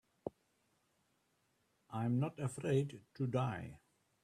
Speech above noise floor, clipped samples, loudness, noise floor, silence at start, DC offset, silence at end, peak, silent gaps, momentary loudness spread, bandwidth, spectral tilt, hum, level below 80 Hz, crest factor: 41 dB; under 0.1%; -39 LUFS; -79 dBFS; 0.25 s; under 0.1%; 0.45 s; -22 dBFS; none; 14 LU; 12 kHz; -7.5 dB/octave; none; -74 dBFS; 20 dB